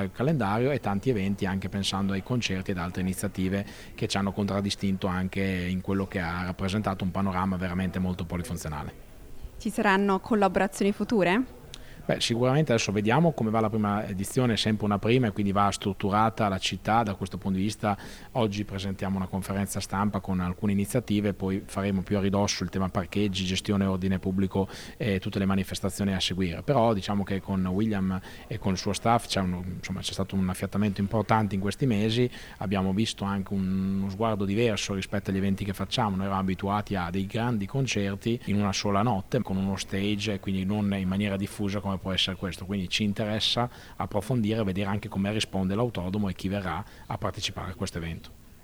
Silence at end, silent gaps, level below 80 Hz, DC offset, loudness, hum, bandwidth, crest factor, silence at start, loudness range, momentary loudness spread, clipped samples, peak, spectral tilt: 0.05 s; none; -48 dBFS; under 0.1%; -28 LUFS; none; 16.5 kHz; 20 dB; 0 s; 4 LU; 8 LU; under 0.1%; -6 dBFS; -5.5 dB/octave